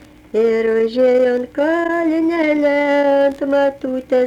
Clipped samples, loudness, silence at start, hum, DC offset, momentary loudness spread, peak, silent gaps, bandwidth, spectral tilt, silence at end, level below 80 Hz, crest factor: under 0.1%; -16 LUFS; 0.35 s; none; under 0.1%; 5 LU; -6 dBFS; none; 10 kHz; -5.5 dB/octave; 0 s; -52 dBFS; 10 dB